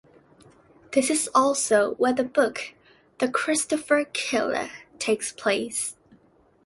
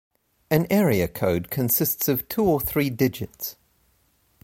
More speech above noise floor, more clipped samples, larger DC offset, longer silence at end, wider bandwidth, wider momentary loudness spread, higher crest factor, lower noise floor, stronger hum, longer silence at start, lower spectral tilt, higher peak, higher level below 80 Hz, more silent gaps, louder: second, 36 dB vs 42 dB; neither; neither; second, 0.75 s vs 0.9 s; second, 12 kHz vs 16.5 kHz; about the same, 9 LU vs 10 LU; about the same, 20 dB vs 18 dB; second, -60 dBFS vs -65 dBFS; neither; first, 0.9 s vs 0.5 s; second, -2 dB/octave vs -5.5 dB/octave; about the same, -6 dBFS vs -6 dBFS; second, -66 dBFS vs -48 dBFS; neither; about the same, -24 LUFS vs -23 LUFS